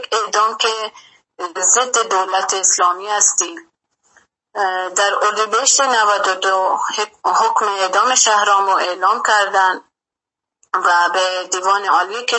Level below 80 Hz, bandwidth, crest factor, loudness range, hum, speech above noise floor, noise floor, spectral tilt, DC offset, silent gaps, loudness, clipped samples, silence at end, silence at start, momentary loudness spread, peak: -76 dBFS; 8.8 kHz; 16 dB; 2 LU; none; 70 dB; -86 dBFS; 1.5 dB/octave; under 0.1%; none; -15 LUFS; under 0.1%; 0 s; 0 s; 8 LU; 0 dBFS